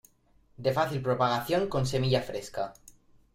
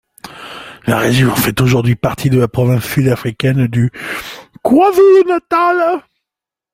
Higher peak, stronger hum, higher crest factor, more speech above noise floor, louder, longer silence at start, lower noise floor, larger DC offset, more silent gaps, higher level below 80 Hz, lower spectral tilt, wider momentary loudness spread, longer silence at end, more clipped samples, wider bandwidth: second, -12 dBFS vs 0 dBFS; neither; about the same, 18 dB vs 14 dB; second, 35 dB vs 73 dB; second, -29 LUFS vs -13 LUFS; first, 0.6 s vs 0.25 s; second, -64 dBFS vs -85 dBFS; neither; neither; second, -56 dBFS vs -42 dBFS; about the same, -6 dB/octave vs -6.5 dB/octave; second, 10 LU vs 15 LU; second, 0.45 s vs 0.75 s; neither; about the same, 16 kHz vs 16.5 kHz